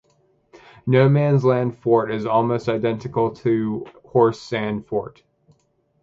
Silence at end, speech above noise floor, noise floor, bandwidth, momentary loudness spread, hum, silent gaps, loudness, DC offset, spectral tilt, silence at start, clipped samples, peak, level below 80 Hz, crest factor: 0.9 s; 45 dB; -64 dBFS; 7.6 kHz; 11 LU; none; none; -20 LUFS; under 0.1%; -8.5 dB/octave; 0.85 s; under 0.1%; -4 dBFS; -58 dBFS; 18 dB